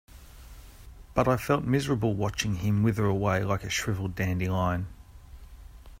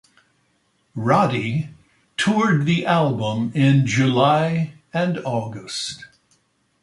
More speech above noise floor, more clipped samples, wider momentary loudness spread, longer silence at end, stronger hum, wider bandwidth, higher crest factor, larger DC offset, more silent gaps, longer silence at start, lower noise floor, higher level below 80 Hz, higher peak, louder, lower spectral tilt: second, 21 dB vs 46 dB; neither; second, 5 LU vs 12 LU; second, 0.05 s vs 0.75 s; neither; first, 16 kHz vs 11.5 kHz; about the same, 20 dB vs 18 dB; neither; neither; second, 0.15 s vs 0.95 s; second, -48 dBFS vs -65 dBFS; first, -46 dBFS vs -60 dBFS; second, -10 dBFS vs -4 dBFS; second, -28 LUFS vs -20 LUFS; about the same, -6 dB/octave vs -6 dB/octave